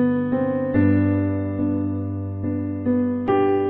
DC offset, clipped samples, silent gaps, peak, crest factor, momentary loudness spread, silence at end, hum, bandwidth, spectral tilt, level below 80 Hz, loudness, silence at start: under 0.1%; under 0.1%; none; -6 dBFS; 14 dB; 8 LU; 0 s; none; 3.8 kHz; -12 dB/octave; -54 dBFS; -22 LUFS; 0 s